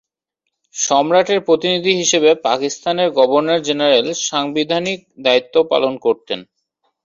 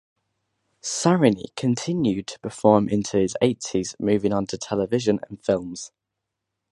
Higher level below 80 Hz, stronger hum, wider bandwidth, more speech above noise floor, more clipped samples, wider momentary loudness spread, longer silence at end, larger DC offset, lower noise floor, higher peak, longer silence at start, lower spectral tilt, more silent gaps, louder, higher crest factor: second, -62 dBFS vs -56 dBFS; neither; second, 7.6 kHz vs 11.5 kHz; about the same, 61 dB vs 60 dB; neither; second, 7 LU vs 11 LU; second, 0.6 s vs 0.85 s; neither; second, -77 dBFS vs -82 dBFS; about the same, -2 dBFS vs -2 dBFS; about the same, 0.75 s vs 0.85 s; second, -2.5 dB/octave vs -5.5 dB/octave; neither; first, -16 LUFS vs -23 LUFS; second, 16 dB vs 22 dB